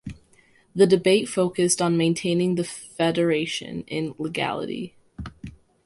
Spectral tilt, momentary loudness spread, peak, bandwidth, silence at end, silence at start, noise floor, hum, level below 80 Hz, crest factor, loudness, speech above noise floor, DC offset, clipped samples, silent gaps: -4.5 dB/octave; 20 LU; -6 dBFS; 11.5 kHz; 0.3 s; 0.05 s; -58 dBFS; none; -54 dBFS; 18 dB; -23 LUFS; 36 dB; under 0.1%; under 0.1%; none